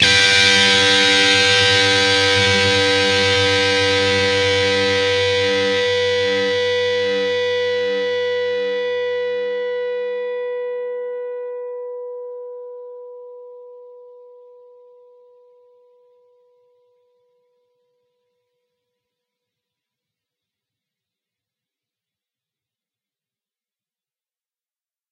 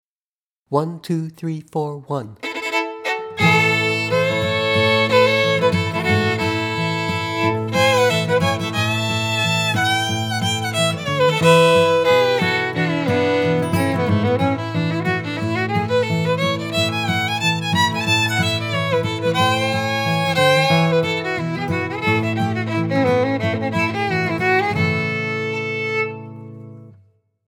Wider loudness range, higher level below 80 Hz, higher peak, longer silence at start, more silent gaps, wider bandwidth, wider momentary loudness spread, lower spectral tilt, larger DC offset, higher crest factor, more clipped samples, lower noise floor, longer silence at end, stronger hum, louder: first, 19 LU vs 4 LU; about the same, -60 dBFS vs -56 dBFS; about the same, 0 dBFS vs -2 dBFS; second, 0 s vs 0.7 s; neither; second, 11.5 kHz vs 18 kHz; first, 19 LU vs 8 LU; second, -2.5 dB/octave vs -5 dB/octave; neither; about the same, 20 dB vs 16 dB; neither; about the same, under -90 dBFS vs under -90 dBFS; first, 10.95 s vs 0.6 s; neither; about the same, -16 LUFS vs -18 LUFS